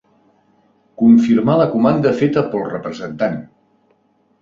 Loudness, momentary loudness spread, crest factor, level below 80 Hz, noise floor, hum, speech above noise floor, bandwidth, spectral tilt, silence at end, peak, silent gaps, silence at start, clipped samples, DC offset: -15 LUFS; 13 LU; 16 dB; -54 dBFS; -59 dBFS; none; 45 dB; 7.2 kHz; -8.5 dB/octave; 0.95 s; -2 dBFS; none; 1 s; under 0.1%; under 0.1%